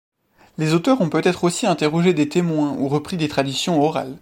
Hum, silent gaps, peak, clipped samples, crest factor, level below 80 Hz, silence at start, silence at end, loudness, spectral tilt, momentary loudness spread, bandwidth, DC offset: none; none; -4 dBFS; under 0.1%; 16 dB; -56 dBFS; 0.6 s; 0.05 s; -19 LUFS; -5.5 dB/octave; 5 LU; 16.5 kHz; under 0.1%